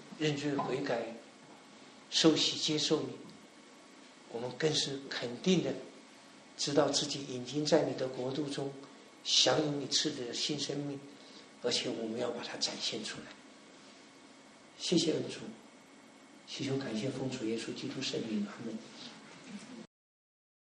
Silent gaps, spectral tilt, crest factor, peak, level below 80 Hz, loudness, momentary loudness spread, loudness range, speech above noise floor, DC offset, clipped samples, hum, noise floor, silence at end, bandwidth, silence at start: none; -3.5 dB/octave; 24 dB; -12 dBFS; -78 dBFS; -33 LUFS; 24 LU; 7 LU; 23 dB; under 0.1%; under 0.1%; none; -57 dBFS; 0.8 s; 10.5 kHz; 0 s